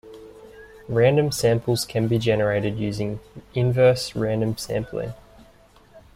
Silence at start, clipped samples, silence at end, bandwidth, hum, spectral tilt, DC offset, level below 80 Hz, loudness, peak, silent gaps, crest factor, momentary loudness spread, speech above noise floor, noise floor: 0.05 s; under 0.1%; 0.15 s; 16 kHz; none; -6 dB/octave; under 0.1%; -50 dBFS; -22 LUFS; -6 dBFS; none; 18 dB; 13 LU; 31 dB; -53 dBFS